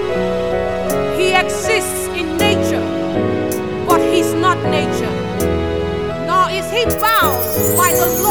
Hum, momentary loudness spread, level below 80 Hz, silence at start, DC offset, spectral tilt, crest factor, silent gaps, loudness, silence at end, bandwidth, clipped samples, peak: none; 7 LU; -36 dBFS; 0 s; 1%; -4 dB/octave; 16 dB; none; -16 LUFS; 0 s; over 20 kHz; under 0.1%; 0 dBFS